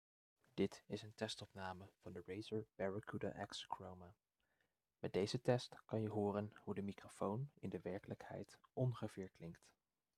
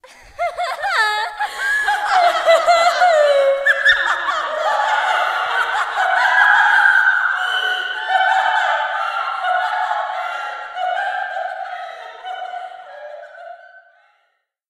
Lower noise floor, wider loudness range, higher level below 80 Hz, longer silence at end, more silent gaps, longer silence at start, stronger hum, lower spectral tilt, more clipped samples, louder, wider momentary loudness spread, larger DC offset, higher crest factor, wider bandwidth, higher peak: first, -87 dBFS vs -67 dBFS; second, 5 LU vs 12 LU; second, -80 dBFS vs -60 dBFS; second, 0.5 s vs 0.9 s; neither; first, 0.55 s vs 0.4 s; neither; first, -6.5 dB/octave vs 1 dB/octave; neither; second, -47 LUFS vs -16 LUFS; second, 14 LU vs 17 LU; neither; first, 24 dB vs 18 dB; about the same, 13.5 kHz vs 14.5 kHz; second, -24 dBFS vs 0 dBFS